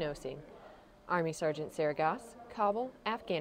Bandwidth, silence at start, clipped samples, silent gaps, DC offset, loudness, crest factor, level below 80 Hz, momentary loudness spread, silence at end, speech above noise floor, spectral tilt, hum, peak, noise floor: 16 kHz; 0 s; under 0.1%; none; under 0.1%; -35 LUFS; 18 dB; -64 dBFS; 17 LU; 0 s; 21 dB; -5.5 dB/octave; none; -18 dBFS; -56 dBFS